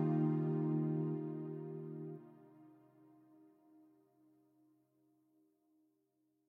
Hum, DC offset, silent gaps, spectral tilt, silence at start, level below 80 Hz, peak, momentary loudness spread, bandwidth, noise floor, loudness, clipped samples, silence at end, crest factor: none; under 0.1%; none; -12 dB/octave; 0 s; under -90 dBFS; -24 dBFS; 18 LU; 3 kHz; -81 dBFS; -39 LUFS; under 0.1%; 3.8 s; 18 dB